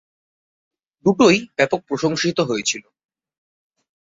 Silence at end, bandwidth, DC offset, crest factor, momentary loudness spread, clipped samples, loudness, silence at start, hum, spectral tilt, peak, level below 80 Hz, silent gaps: 1.25 s; 8 kHz; under 0.1%; 20 dB; 7 LU; under 0.1%; -19 LUFS; 1.05 s; none; -4 dB/octave; -2 dBFS; -60 dBFS; none